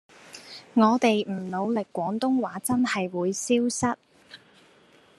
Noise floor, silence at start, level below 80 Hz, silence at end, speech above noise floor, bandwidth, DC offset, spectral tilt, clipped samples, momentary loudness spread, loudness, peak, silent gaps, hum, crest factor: -57 dBFS; 0.3 s; -68 dBFS; 0.85 s; 32 dB; 13 kHz; under 0.1%; -4.5 dB/octave; under 0.1%; 17 LU; -25 LUFS; -6 dBFS; none; none; 20 dB